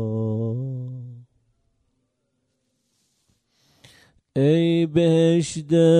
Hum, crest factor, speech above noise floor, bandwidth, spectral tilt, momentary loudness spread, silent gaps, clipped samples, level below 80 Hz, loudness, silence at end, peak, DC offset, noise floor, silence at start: none; 18 dB; 56 dB; 10.5 kHz; -7 dB/octave; 16 LU; none; under 0.1%; -62 dBFS; -21 LUFS; 0 s; -6 dBFS; under 0.1%; -73 dBFS; 0 s